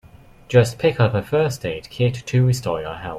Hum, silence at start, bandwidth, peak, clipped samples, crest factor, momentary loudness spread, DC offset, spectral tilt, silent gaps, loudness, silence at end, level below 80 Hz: none; 0.05 s; 14.5 kHz; -2 dBFS; under 0.1%; 18 dB; 9 LU; under 0.1%; -6.5 dB/octave; none; -20 LUFS; 0 s; -48 dBFS